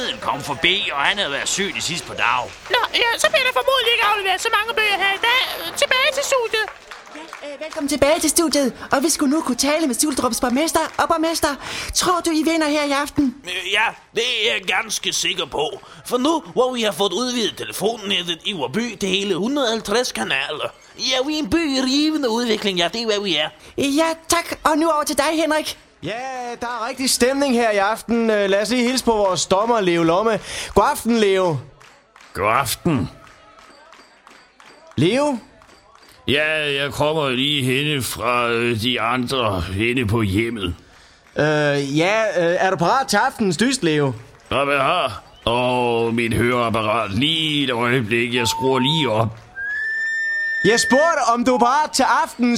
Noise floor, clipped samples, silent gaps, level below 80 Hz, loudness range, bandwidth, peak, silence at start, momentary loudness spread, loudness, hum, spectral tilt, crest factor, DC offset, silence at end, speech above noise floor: -49 dBFS; under 0.1%; none; -48 dBFS; 3 LU; 16.5 kHz; 0 dBFS; 0 s; 8 LU; -19 LUFS; none; -3.5 dB/octave; 20 dB; under 0.1%; 0 s; 29 dB